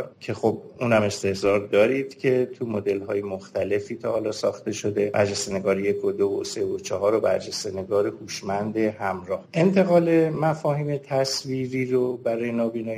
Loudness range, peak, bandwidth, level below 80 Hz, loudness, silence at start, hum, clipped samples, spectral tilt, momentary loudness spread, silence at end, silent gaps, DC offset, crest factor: 3 LU; -6 dBFS; 15.5 kHz; -64 dBFS; -24 LUFS; 0 s; none; under 0.1%; -5.5 dB/octave; 8 LU; 0 s; none; under 0.1%; 16 dB